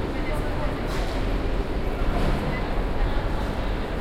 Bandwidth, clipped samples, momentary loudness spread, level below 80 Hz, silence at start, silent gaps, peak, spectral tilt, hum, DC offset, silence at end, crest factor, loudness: 14 kHz; under 0.1%; 3 LU; -26 dBFS; 0 s; none; -12 dBFS; -6.5 dB/octave; none; under 0.1%; 0 s; 14 dB; -28 LUFS